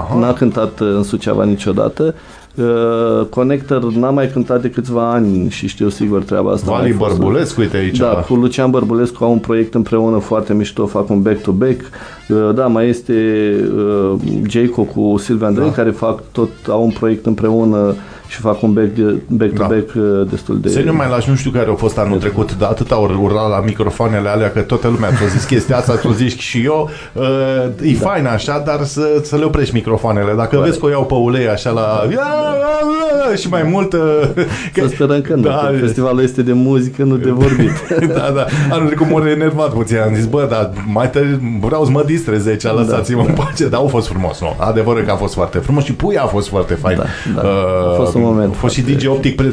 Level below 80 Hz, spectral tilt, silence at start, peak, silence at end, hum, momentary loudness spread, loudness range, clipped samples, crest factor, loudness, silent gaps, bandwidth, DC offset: -34 dBFS; -7 dB/octave; 0 s; 0 dBFS; 0 s; none; 4 LU; 2 LU; under 0.1%; 14 dB; -14 LUFS; none; 11 kHz; under 0.1%